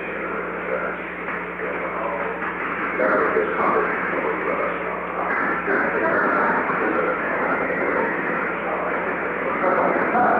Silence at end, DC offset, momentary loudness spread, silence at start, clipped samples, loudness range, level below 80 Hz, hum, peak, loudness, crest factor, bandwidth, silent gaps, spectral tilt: 0 s; under 0.1%; 7 LU; 0 s; under 0.1%; 2 LU; -54 dBFS; 60 Hz at -55 dBFS; -8 dBFS; -22 LUFS; 14 dB; 5.8 kHz; none; -8 dB/octave